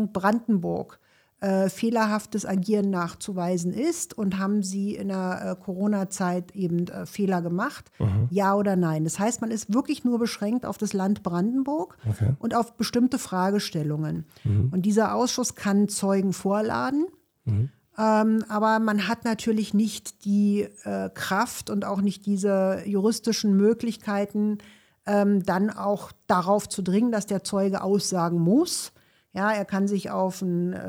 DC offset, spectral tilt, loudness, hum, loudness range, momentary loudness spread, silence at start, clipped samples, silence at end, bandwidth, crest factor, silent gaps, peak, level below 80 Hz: under 0.1%; -6 dB/octave; -25 LUFS; none; 3 LU; 7 LU; 0 s; under 0.1%; 0 s; 16.5 kHz; 16 dB; none; -8 dBFS; -60 dBFS